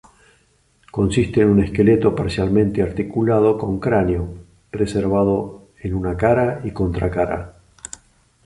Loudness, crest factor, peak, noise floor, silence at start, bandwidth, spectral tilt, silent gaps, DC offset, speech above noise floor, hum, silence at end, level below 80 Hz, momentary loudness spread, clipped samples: -19 LUFS; 16 dB; -2 dBFS; -59 dBFS; 0.95 s; 11.5 kHz; -7.5 dB/octave; none; under 0.1%; 41 dB; none; 0.95 s; -36 dBFS; 17 LU; under 0.1%